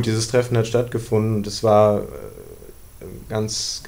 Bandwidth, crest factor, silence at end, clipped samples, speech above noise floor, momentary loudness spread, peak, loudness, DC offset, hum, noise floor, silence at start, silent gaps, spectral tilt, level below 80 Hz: 16 kHz; 18 dB; 0 s; under 0.1%; 21 dB; 23 LU; -4 dBFS; -20 LUFS; under 0.1%; none; -41 dBFS; 0 s; none; -5.5 dB/octave; -44 dBFS